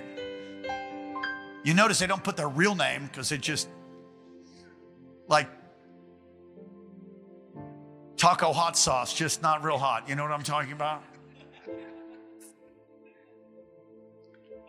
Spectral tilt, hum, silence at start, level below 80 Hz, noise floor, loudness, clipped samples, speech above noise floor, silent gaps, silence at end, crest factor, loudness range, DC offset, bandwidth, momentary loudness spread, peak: -3 dB/octave; none; 0 s; -64 dBFS; -57 dBFS; -27 LUFS; under 0.1%; 30 dB; none; 0.1 s; 24 dB; 11 LU; under 0.1%; 16 kHz; 25 LU; -8 dBFS